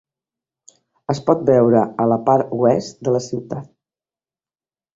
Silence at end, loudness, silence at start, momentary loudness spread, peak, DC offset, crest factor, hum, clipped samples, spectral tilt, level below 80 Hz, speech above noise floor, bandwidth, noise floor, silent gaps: 1.3 s; -18 LUFS; 1.1 s; 14 LU; -2 dBFS; under 0.1%; 18 dB; none; under 0.1%; -7.5 dB/octave; -58 dBFS; over 73 dB; 7.8 kHz; under -90 dBFS; none